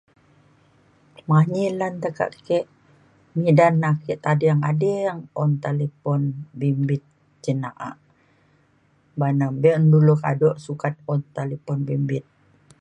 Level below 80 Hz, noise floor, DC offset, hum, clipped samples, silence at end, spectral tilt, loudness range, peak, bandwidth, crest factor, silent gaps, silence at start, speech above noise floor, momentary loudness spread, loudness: -64 dBFS; -61 dBFS; under 0.1%; none; under 0.1%; 0.6 s; -9 dB/octave; 6 LU; -2 dBFS; 8.6 kHz; 20 dB; none; 1.3 s; 40 dB; 13 LU; -22 LUFS